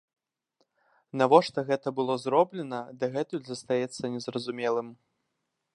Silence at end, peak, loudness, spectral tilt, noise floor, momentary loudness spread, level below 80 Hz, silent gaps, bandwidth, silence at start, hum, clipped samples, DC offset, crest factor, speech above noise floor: 0.8 s; -4 dBFS; -28 LUFS; -5.5 dB/octave; -81 dBFS; 14 LU; -78 dBFS; none; 11 kHz; 1.15 s; none; under 0.1%; under 0.1%; 26 dB; 53 dB